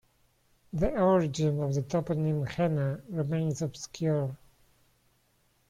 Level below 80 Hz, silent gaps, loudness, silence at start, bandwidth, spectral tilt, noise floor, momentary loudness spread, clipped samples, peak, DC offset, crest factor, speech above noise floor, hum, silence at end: -50 dBFS; none; -30 LUFS; 0.75 s; 11 kHz; -7 dB/octave; -69 dBFS; 10 LU; under 0.1%; -12 dBFS; under 0.1%; 18 dB; 41 dB; none; 1.35 s